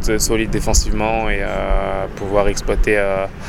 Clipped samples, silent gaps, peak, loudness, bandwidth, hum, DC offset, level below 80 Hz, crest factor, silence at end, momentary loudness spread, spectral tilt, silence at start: under 0.1%; none; 0 dBFS; -19 LUFS; 16 kHz; none; under 0.1%; -22 dBFS; 16 dB; 0 s; 4 LU; -4 dB/octave; 0 s